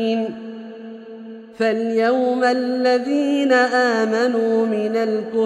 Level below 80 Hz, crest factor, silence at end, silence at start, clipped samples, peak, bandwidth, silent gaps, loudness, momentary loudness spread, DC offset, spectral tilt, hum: -70 dBFS; 14 dB; 0 s; 0 s; under 0.1%; -4 dBFS; 11.5 kHz; none; -19 LUFS; 20 LU; under 0.1%; -5 dB/octave; none